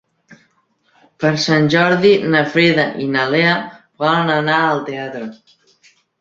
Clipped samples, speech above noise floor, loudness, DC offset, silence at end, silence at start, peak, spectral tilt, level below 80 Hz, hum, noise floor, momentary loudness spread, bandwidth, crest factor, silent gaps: under 0.1%; 46 dB; -15 LUFS; under 0.1%; 0.85 s; 0.3 s; 0 dBFS; -5.5 dB/octave; -58 dBFS; none; -61 dBFS; 13 LU; 7.8 kHz; 16 dB; none